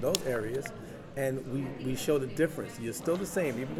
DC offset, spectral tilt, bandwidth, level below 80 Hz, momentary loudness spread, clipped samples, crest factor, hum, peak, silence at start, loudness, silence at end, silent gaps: under 0.1%; -5 dB/octave; 18 kHz; -56 dBFS; 8 LU; under 0.1%; 26 dB; none; -8 dBFS; 0 s; -33 LUFS; 0 s; none